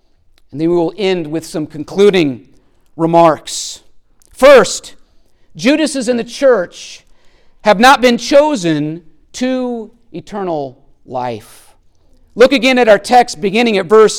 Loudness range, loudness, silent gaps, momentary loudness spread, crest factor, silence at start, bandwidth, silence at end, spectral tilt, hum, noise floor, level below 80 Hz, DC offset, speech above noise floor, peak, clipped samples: 6 LU; -12 LUFS; none; 20 LU; 14 dB; 0.55 s; 17.5 kHz; 0 s; -4.5 dB/octave; none; -48 dBFS; -44 dBFS; under 0.1%; 37 dB; 0 dBFS; under 0.1%